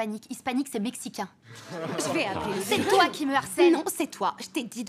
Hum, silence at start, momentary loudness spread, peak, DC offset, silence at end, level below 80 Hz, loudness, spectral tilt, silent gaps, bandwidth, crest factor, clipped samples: none; 0 s; 14 LU; -8 dBFS; under 0.1%; 0 s; -66 dBFS; -27 LUFS; -3.5 dB/octave; none; 16 kHz; 18 dB; under 0.1%